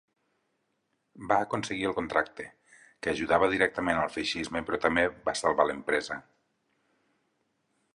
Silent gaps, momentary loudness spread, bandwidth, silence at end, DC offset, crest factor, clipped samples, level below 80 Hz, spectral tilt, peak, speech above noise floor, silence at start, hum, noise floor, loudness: none; 12 LU; 11.5 kHz; 1.75 s; under 0.1%; 22 dB; under 0.1%; -58 dBFS; -4 dB/octave; -8 dBFS; 49 dB; 1.15 s; none; -77 dBFS; -28 LUFS